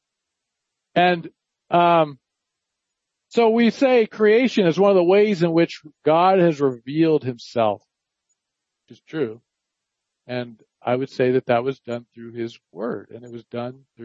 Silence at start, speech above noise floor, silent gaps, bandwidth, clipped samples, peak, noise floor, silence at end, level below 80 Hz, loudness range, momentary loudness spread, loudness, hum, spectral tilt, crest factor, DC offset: 0.95 s; 62 dB; none; 7.8 kHz; under 0.1%; -4 dBFS; -82 dBFS; 0 s; -72 dBFS; 11 LU; 16 LU; -19 LUFS; none; -7 dB/octave; 18 dB; under 0.1%